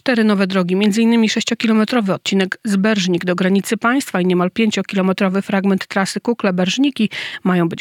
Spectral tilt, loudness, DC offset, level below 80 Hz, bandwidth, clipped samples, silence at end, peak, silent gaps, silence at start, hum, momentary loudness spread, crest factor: -5.5 dB/octave; -17 LUFS; under 0.1%; -66 dBFS; 15.5 kHz; under 0.1%; 0 s; -2 dBFS; none; 0.05 s; none; 4 LU; 16 dB